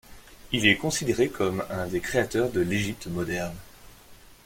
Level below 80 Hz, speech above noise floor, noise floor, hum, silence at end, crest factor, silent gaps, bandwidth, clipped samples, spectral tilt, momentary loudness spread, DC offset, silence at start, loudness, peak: -50 dBFS; 24 dB; -50 dBFS; none; 0.1 s; 24 dB; none; 16.5 kHz; under 0.1%; -4.5 dB/octave; 10 LU; under 0.1%; 0.1 s; -26 LUFS; -4 dBFS